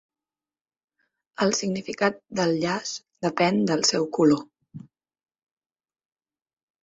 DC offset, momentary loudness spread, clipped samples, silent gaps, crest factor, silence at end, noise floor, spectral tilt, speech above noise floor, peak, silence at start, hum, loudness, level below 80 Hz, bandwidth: under 0.1%; 8 LU; under 0.1%; none; 22 dB; 2.05 s; under -90 dBFS; -4 dB/octave; over 67 dB; -6 dBFS; 1.4 s; none; -24 LUFS; -66 dBFS; 8.2 kHz